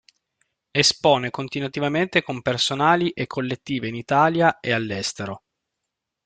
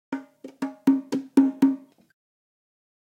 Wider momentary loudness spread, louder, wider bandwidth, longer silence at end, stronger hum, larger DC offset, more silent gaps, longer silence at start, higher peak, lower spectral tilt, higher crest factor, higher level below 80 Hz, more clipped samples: second, 10 LU vs 15 LU; first, -21 LUFS vs -24 LUFS; second, 9.4 kHz vs 11 kHz; second, 0.9 s vs 1.25 s; neither; neither; neither; first, 0.75 s vs 0.1 s; first, -2 dBFS vs -6 dBFS; second, -4 dB/octave vs -6.5 dB/octave; about the same, 20 dB vs 20 dB; first, -60 dBFS vs -74 dBFS; neither